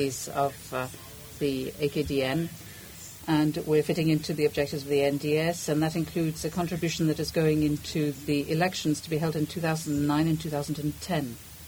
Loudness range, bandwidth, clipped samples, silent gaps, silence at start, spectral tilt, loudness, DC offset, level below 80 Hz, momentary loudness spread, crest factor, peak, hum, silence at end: 3 LU; over 20 kHz; under 0.1%; none; 0 s; -5.5 dB/octave; -28 LUFS; under 0.1%; -52 dBFS; 9 LU; 16 dB; -12 dBFS; none; 0 s